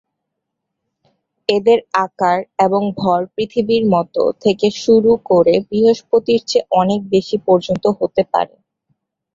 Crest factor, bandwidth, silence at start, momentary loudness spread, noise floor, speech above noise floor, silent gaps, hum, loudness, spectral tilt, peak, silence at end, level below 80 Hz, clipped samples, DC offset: 14 dB; 7.6 kHz; 1.5 s; 6 LU; -77 dBFS; 62 dB; none; none; -16 LUFS; -6 dB/octave; -2 dBFS; 0.9 s; -56 dBFS; under 0.1%; under 0.1%